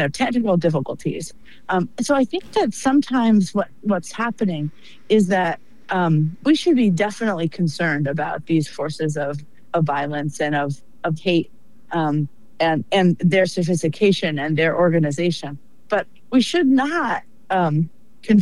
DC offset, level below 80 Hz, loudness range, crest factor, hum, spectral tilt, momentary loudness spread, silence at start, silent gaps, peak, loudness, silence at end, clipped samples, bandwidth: 1%; -56 dBFS; 4 LU; 16 dB; none; -6 dB/octave; 11 LU; 0 s; none; -6 dBFS; -20 LUFS; 0 s; under 0.1%; 12 kHz